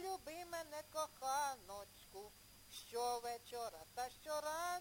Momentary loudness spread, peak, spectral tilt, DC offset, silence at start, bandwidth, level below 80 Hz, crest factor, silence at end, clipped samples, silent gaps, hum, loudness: 14 LU; -28 dBFS; -1.5 dB/octave; under 0.1%; 0 s; 17 kHz; -74 dBFS; 18 dB; 0 s; under 0.1%; none; none; -46 LUFS